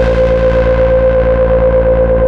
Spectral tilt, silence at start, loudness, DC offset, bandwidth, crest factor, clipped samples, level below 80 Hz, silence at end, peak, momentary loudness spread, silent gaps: -9 dB/octave; 0 s; -10 LUFS; 1%; 5.8 kHz; 8 dB; under 0.1%; -16 dBFS; 0 s; -2 dBFS; 1 LU; none